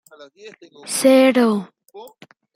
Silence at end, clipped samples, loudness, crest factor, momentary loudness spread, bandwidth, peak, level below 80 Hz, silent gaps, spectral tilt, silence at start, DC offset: 0.5 s; under 0.1%; -16 LUFS; 18 dB; 13 LU; 16 kHz; -2 dBFS; -70 dBFS; none; -4 dB/octave; 0.2 s; under 0.1%